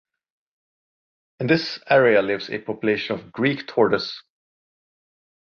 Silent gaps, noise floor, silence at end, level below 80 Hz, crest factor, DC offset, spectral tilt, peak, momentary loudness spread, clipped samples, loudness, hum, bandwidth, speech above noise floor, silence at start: none; under -90 dBFS; 1.35 s; -64 dBFS; 20 dB; under 0.1%; -6.5 dB/octave; -4 dBFS; 13 LU; under 0.1%; -21 LUFS; none; 6.8 kHz; over 69 dB; 1.4 s